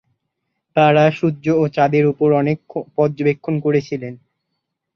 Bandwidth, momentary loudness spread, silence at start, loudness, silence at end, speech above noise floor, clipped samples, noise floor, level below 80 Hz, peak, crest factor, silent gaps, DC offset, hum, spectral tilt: 6.6 kHz; 11 LU; 0.75 s; -17 LUFS; 0.8 s; 60 dB; under 0.1%; -76 dBFS; -60 dBFS; -2 dBFS; 16 dB; none; under 0.1%; none; -8 dB/octave